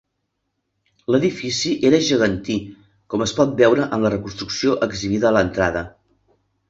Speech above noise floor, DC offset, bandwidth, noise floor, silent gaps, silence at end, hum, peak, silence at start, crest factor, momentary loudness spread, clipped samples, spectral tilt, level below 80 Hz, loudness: 56 dB; under 0.1%; 8 kHz; -75 dBFS; none; 0.8 s; none; -2 dBFS; 1.1 s; 18 dB; 11 LU; under 0.1%; -5 dB/octave; -46 dBFS; -19 LUFS